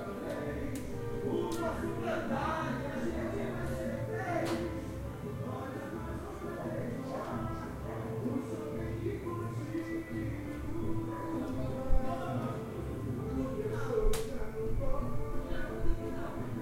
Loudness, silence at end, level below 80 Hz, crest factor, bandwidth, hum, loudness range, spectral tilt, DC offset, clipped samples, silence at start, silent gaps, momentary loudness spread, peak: -37 LUFS; 0 s; -40 dBFS; 20 dB; 16 kHz; none; 3 LU; -7 dB/octave; under 0.1%; under 0.1%; 0 s; none; 6 LU; -16 dBFS